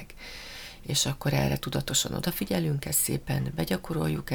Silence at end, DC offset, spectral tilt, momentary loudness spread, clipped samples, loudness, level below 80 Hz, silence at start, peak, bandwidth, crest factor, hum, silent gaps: 0 s; under 0.1%; -4 dB/octave; 15 LU; under 0.1%; -28 LUFS; -46 dBFS; 0 s; -12 dBFS; over 20 kHz; 18 dB; none; none